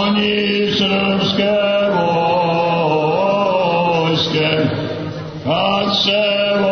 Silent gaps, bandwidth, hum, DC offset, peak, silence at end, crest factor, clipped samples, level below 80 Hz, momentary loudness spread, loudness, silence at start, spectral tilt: none; 6.6 kHz; none; under 0.1%; -2 dBFS; 0 s; 14 dB; under 0.1%; -48 dBFS; 4 LU; -16 LUFS; 0 s; -6 dB/octave